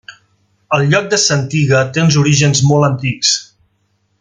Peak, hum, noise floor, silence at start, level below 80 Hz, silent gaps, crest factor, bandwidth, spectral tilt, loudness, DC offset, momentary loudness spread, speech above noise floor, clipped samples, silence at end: 0 dBFS; none; -62 dBFS; 0.1 s; -50 dBFS; none; 14 dB; 9.4 kHz; -4 dB/octave; -12 LUFS; under 0.1%; 5 LU; 50 dB; under 0.1%; 0.8 s